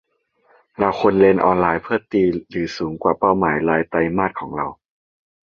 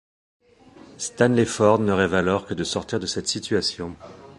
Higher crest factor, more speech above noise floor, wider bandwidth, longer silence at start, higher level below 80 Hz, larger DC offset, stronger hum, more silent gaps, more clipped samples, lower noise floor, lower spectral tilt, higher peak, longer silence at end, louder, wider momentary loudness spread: about the same, 18 dB vs 22 dB; first, 42 dB vs 27 dB; second, 7 kHz vs 11.5 kHz; about the same, 0.8 s vs 0.9 s; about the same, -48 dBFS vs -50 dBFS; neither; neither; neither; neither; first, -60 dBFS vs -49 dBFS; first, -7.5 dB/octave vs -4.5 dB/octave; about the same, -2 dBFS vs -2 dBFS; first, 0.7 s vs 0.05 s; first, -19 LUFS vs -22 LUFS; about the same, 12 LU vs 13 LU